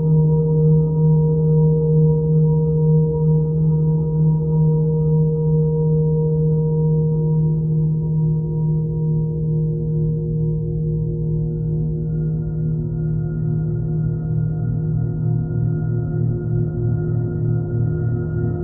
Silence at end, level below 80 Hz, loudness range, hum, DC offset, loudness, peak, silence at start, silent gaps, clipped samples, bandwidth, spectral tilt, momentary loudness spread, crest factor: 0 s; -34 dBFS; 5 LU; none; under 0.1%; -19 LUFS; -6 dBFS; 0 s; none; under 0.1%; 1.5 kHz; -16 dB/octave; 6 LU; 12 dB